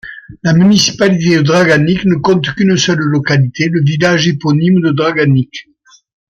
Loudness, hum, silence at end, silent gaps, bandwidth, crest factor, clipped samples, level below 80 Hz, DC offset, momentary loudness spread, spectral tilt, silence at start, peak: -11 LUFS; none; 0.75 s; none; 8.6 kHz; 12 dB; under 0.1%; -46 dBFS; under 0.1%; 4 LU; -5.5 dB/octave; 0.05 s; 0 dBFS